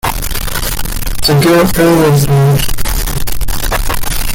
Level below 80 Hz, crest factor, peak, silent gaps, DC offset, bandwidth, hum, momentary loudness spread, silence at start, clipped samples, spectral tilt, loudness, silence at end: -18 dBFS; 10 dB; 0 dBFS; none; under 0.1%; 17 kHz; none; 10 LU; 0.05 s; under 0.1%; -5 dB/octave; -12 LUFS; 0 s